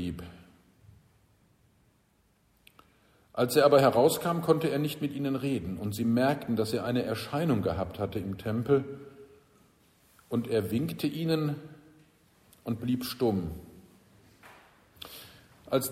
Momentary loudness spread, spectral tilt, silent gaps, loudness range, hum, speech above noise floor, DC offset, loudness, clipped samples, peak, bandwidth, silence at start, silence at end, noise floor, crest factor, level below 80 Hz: 20 LU; -6 dB/octave; none; 9 LU; none; 40 dB; under 0.1%; -29 LUFS; under 0.1%; -8 dBFS; 16 kHz; 0 s; 0 s; -68 dBFS; 22 dB; -58 dBFS